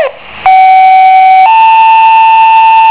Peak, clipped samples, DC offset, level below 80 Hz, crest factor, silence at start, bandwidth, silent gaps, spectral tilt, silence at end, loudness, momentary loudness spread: 0 dBFS; 10%; under 0.1%; -48 dBFS; 4 dB; 0 s; 4 kHz; none; -4 dB/octave; 0 s; -3 LUFS; 3 LU